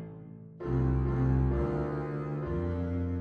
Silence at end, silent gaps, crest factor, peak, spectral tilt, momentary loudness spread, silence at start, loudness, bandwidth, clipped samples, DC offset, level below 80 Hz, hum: 0 s; none; 14 dB; -18 dBFS; -11 dB/octave; 14 LU; 0 s; -31 LUFS; 4.5 kHz; under 0.1%; under 0.1%; -38 dBFS; none